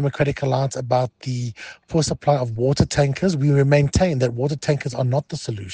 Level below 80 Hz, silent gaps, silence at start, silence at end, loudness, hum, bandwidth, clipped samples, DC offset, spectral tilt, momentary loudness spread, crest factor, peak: -42 dBFS; none; 0 s; 0 s; -21 LUFS; none; 9.6 kHz; under 0.1%; under 0.1%; -6 dB/octave; 10 LU; 18 dB; -2 dBFS